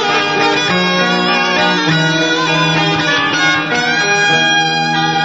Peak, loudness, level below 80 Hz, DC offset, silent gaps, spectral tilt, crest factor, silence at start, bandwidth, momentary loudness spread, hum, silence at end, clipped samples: 0 dBFS; -12 LUFS; -54 dBFS; 0.2%; none; -3.5 dB/octave; 12 dB; 0 s; 7.8 kHz; 3 LU; none; 0 s; under 0.1%